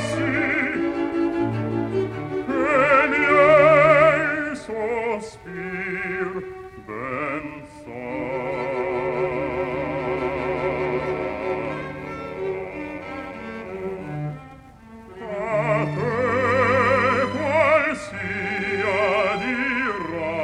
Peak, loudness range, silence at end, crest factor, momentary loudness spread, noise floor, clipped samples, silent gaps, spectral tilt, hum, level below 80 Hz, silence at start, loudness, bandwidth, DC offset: -4 dBFS; 12 LU; 0 s; 18 dB; 16 LU; -44 dBFS; under 0.1%; none; -6.5 dB/octave; none; -50 dBFS; 0 s; -22 LUFS; 10.5 kHz; under 0.1%